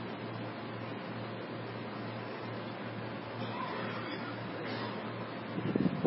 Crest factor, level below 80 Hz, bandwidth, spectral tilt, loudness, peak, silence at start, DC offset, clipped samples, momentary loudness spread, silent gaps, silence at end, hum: 24 dB; -72 dBFS; 5.6 kHz; -5 dB/octave; -39 LUFS; -14 dBFS; 0 s; under 0.1%; under 0.1%; 4 LU; none; 0 s; none